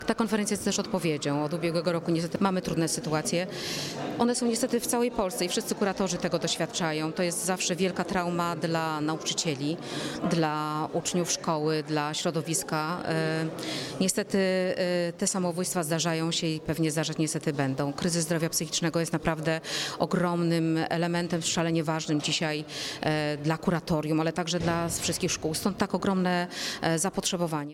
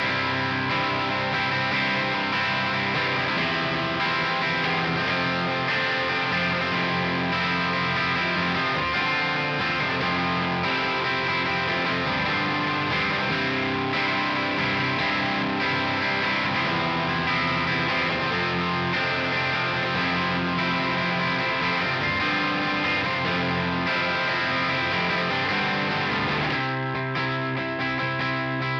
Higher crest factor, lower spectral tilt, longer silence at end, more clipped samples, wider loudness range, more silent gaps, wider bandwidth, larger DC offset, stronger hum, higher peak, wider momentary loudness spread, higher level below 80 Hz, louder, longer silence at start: about the same, 16 dB vs 12 dB; second, -4 dB/octave vs -5.5 dB/octave; about the same, 0 s vs 0 s; neither; about the same, 1 LU vs 0 LU; neither; first, 16.5 kHz vs 9 kHz; neither; neither; about the same, -12 dBFS vs -12 dBFS; about the same, 3 LU vs 1 LU; about the same, -58 dBFS vs -54 dBFS; second, -28 LUFS vs -23 LUFS; about the same, 0 s vs 0 s